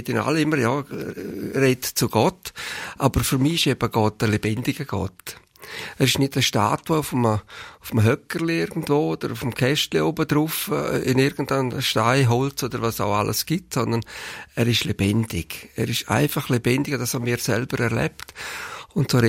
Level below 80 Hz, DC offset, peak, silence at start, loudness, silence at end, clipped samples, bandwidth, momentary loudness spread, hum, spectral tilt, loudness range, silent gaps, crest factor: -48 dBFS; under 0.1%; -4 dBFS; 0 s; -22 LUFS; 0 s; under 0.1%; 16.5 kHz; 12 LU; none; -5 dB/octave; 2 LU; none; 18 dB